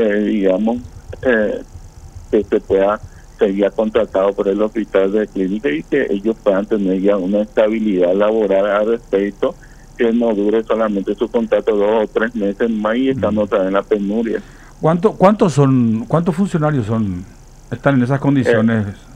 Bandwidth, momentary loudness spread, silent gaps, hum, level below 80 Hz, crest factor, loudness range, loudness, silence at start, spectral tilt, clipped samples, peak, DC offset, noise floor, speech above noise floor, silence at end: 10 kHz; 6 LU; none; none; -42 dBFS; 16 dB; 2 LU; -16 LUFS; 0 s; -7.5 dB/octave; under 0.1%; 0 dBFS; under 0.1%; -35 dBFS; 20 dB; 0 s